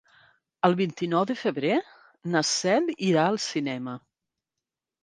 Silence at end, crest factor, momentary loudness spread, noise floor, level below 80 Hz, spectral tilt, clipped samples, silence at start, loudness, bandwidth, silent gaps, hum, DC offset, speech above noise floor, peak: 1.05 s; 22 dB; 10 LU; -88 dBFS; -74 dBFS; -4.5 dB/octave; under 0.1%; 0.65 s; -26 LUFS; 10 kHz; none; none; under 0.1%; 63 dB; -6 dBFS